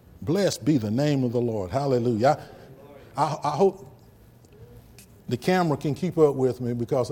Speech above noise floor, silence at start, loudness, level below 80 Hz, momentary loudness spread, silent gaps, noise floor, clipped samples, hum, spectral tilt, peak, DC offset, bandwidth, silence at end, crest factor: 29 dB; 0.2 s; -24 LUFS; -56 dBFS; 8 LU; none; -52 dBFS; under 0.1%; none; -6.5 dB/octave; -6 dBFS; under 0.1%; 17 kHz; 0 s; 18 dB